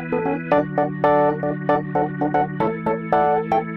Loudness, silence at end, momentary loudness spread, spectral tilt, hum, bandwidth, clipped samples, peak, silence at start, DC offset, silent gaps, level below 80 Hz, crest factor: -21 LUFS; 0 s; 5 LU; -9.5 dB/octave; none; 6 kHz; under 0.1%; -6 dBFS; 0 s; under 0.1%; none; -52 dBFS; 16 dB